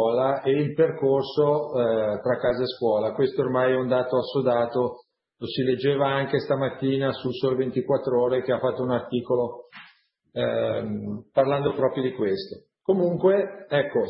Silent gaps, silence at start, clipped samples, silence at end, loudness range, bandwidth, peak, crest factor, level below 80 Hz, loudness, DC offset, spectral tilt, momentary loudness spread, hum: none; 0 s; under 0.1%; 0 s; 3 LU; 5.8 kHz; -8 dBFS; 16 dB; -62 dBFS; -24 LUFS; under 0.1%; -11 dB/octave; 5 LU; none